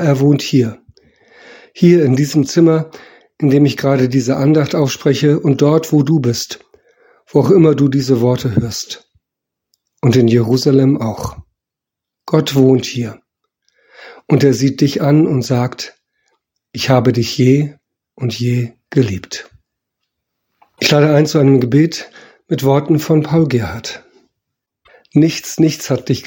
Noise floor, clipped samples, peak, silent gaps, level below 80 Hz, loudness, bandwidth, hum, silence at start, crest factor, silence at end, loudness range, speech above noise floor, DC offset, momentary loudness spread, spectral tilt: -83 dBFS; under 0.1%; 0 dBFS; none; -50 dBFS; -14 LUFS; 17 kHz; none; 0 s; 14 dB; 0 s; 4 LU; 70 dB; under 0.1%; 13 LU; -6.5 dB/octave